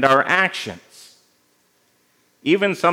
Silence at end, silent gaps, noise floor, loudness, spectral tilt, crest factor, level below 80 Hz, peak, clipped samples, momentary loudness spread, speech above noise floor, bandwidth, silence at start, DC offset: 0 s; none; -62 dBFS; -18 LUFS; -4.5 dB/octave; 20 dB; -74 dBFS; 0 dBFS; under 0.1%; 17 LU; 44 dB; 16.5 kHz; 0 s; under 0.1%